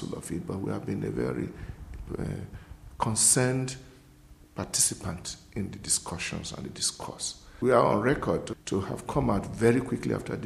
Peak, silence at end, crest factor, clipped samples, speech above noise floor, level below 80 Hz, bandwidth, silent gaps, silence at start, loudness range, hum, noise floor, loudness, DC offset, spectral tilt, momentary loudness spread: -6 dBFS; 0 s; 22 dB; under 0.1%; 25 dB; -48 dBFS; 13.5 kHz; none; 0 s; 3 LU; none; -53 dBFS; -28 LUFS; under 0.1%; -4 dB/octave; 16 LU